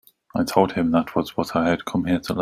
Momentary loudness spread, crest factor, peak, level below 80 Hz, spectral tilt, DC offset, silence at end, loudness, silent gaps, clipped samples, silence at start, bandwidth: 5 LU; 20 dB; -2 dBFS; -52 dBFS; -6 dB/octave; under 0.1%; 0 s; -22 LUFS; none; under 0.1%; 0.35 s; 16 kHz